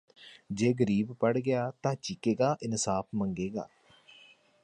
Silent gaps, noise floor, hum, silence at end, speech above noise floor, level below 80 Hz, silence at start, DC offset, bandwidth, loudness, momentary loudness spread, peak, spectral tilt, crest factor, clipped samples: none; -59 dBFS; none; 1 s; 29 dB; -64 dBFS; 0.2 s; under 0.1%; 11 kHz; -31 LUFS; 8 LU; -14 dBFS; -5.5 dB/octave; 18 dB; under 0.1%